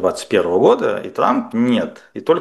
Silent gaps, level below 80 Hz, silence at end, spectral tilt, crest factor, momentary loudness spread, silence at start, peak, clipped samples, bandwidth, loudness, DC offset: none; -60 dBFS; 0 s; -5.5 dB/octave; 16 dB; 7 LU; 0 s; 0 dBFS; under 0.1%; 12.5 kHz; -17 LUFS; under 0.1%